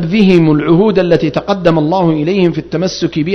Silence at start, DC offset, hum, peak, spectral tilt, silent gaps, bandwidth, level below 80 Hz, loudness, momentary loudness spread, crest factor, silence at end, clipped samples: 0 s; under 0.1%; none; 0 dBFS; -7 dB/octave; none; 6.4 kHz; -40 dBFS; -11 LUFS; 7 LU; 10 dB; 0 s; 0.4%